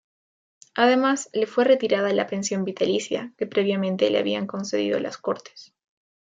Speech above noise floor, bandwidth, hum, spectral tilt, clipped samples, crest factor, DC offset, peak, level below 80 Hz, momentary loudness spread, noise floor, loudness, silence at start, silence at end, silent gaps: over 67 dB; 9.4 kHz; none; -4.5 dB/octave; under 0.1%; 18 dB; under 0.1%; -6 dBFS; -74 dBFS; 9 LU; under -90 dBFS; -23 LUFS; 0.75 s; 0.7 s; none